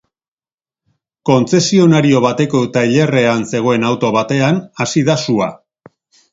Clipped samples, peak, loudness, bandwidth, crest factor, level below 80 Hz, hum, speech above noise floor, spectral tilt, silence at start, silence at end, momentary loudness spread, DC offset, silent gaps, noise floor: under 0.1%; 0 dBFS; -13 LUFS; 7.8 kHz; 14 dB; -54 dBFS; none; over 77 dB; -5.5 dB/octave; 1.25 s; 0.75 s; 7 LU; under 0.1%; none; under -90 dBFS